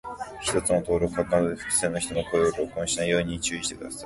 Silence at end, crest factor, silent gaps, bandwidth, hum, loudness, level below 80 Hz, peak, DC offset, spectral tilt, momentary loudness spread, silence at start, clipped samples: 0 s; 18 dB; none; 12 kHz; none; -26 LUFS; -48 dBFS; -8 dBFS; under 0.1%; -3.5 dB/octave; 6 LU; 0.05 s; under 0.1%